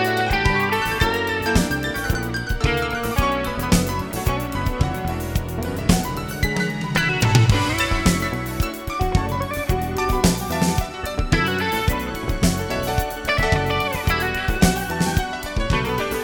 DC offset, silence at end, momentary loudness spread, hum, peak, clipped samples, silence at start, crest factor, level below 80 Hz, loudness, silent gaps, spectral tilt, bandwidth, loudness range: under 0.1%; 0 s; 6 LU; none; -2 dBFS; under 0.1%; 0 s; 18 dB; -28 dBFS; -21 LUFS; none; -5 dB/octave; 17.5 kHz; 2 LU